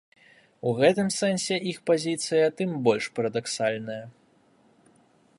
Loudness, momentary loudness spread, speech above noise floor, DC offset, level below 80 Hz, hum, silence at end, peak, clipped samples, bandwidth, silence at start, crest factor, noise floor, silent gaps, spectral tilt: -26 LUFS; 9 LU; 36 dB; under 0.1%; -72 dBFS; none; 1.3 s; -8 dBFS; under 0.1%; 11.5 kHz; 0.65 s; 20 dB; -62 dBFS; none; -4.5 dB/octave